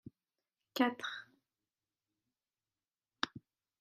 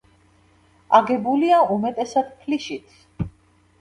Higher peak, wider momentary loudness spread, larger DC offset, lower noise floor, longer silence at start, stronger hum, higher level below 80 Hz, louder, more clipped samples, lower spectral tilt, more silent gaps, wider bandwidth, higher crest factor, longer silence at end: second, -14 dBFS vs 0 dBFS; about the same, 14 LU vs 15 LU; neither; first, under -90 dBFS vs -57 dBFS; second, 0.05 s vs 0.9 s; neither; second, -84 dBFS vs -50 dBFS; second, -38 LUFS vs -20 LUFS; neither; second, -3.5 dB/octave vs -6 dB/octave; neither; first, 14.5 kHz vs 11 kHz; first, 30 dB vs 22 dB; about the same, 0.45 s vs 0.5 s